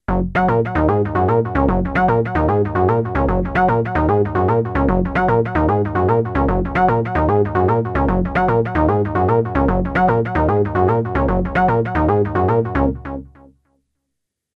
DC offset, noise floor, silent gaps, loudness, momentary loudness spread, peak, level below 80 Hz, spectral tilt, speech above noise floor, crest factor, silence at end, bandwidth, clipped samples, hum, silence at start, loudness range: under 0.1%; -78 dBFS; none; -17 LUFS; 2 LU; -2 dBFS; -28 dBFS; -10 dB/octave; 61 dB; 14 dB; 1.3 s; 6 kHz; under 0.1%; none; 0.1 s; 1 LU